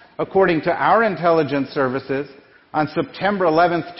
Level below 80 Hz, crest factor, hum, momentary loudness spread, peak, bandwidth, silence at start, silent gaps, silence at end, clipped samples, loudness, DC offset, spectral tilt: -54 dBFS; 16 dB; none; 9 LU; -4 dBFS; 5.8 kHz; 0.2 s; none; 0 s; under 0.1%; -19 LUFS; under 0.1%; -9.5 dB/octave